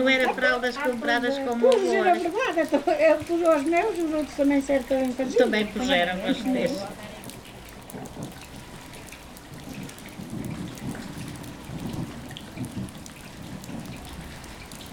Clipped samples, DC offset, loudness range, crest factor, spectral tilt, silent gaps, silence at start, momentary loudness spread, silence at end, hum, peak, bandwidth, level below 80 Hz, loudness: under 0.1%; under 0.1%; 15 LU; 20 dB; -5 dB/octave; none; 0 s; 20 LU; 0 s; none; -6 dBFS; 19 kHz; -50 dBFS; -24 LUFS